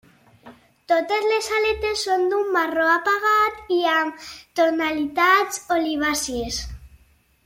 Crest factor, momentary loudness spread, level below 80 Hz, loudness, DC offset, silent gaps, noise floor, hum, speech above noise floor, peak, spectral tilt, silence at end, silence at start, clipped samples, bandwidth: 16 dB; 9 LU; -48 dBFS; -21 LUFS; under 0.1%; none; -58 dBFS; none; 37 dB; -6 dBFS; -2.5 dB/octave; 0.6 s; 0.45 s; under 0.1%; 16.5 kHz